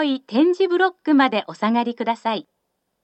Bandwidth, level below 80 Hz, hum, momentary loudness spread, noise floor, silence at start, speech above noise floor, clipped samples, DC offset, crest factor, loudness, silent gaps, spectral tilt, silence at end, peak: 8.4 kHz; -84 dBFS; none; 7 LU; -74 dBFS; 0 s; 55 dB; under 0.1%; under 0.1%; 18 dB; -20 LUFS; none; -6 dB/octave; 0.6 s; -4 dBFS